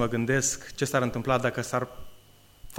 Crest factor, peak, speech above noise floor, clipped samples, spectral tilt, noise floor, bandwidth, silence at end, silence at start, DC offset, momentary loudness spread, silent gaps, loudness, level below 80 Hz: 20 dB; -8 dBFS; 27 dB; under 0.1%; -4.5 dB/octave; -54 dBFS; 16.5 kHz; 0 s; 0 s; under 0.1%; 6 LU; none; -27 LUFS; -50 dBFS